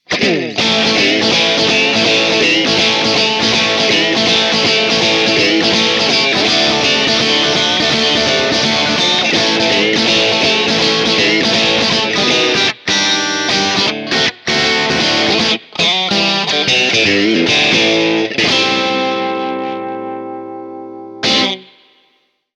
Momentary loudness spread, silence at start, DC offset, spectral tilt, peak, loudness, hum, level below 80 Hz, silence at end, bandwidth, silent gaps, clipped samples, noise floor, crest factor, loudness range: 6 LU; 0.1 s; under 0.1%; -2.5 dB/octave; 0 dBFS; -11 LUFS; none; -48 dBFS; 0.95 s; 11.5 kHz; none; under 0.1%; -59 dBFS; 14 dB; 3 LU